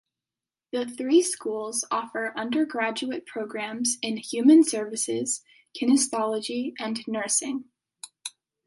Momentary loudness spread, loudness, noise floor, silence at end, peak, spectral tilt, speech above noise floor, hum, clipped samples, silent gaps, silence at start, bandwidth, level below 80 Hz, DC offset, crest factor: 13 LU; -25 LUFS; under -90 dBFS; 0.4 s; -8 dBFS; -2.5 dB/octave; over 65 dB; none; under 0.1%; none; 0.75 s; 11.5 kHz; -80 dBFS; under 0.1%; 18 dB